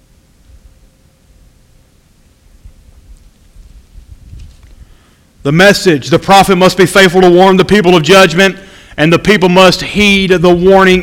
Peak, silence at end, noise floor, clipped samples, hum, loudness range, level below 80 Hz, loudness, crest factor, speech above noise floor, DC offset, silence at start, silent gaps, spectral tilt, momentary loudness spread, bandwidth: 0 dBFS; 0 s; -46 dBFS; 2%; none; 8 LU; -34 dBFS; -7 LUFS; 10 dB; 40 dB; under 0.1%; 4.35 s; none; -5 dB/octave; 6 LU; 16.5 kHz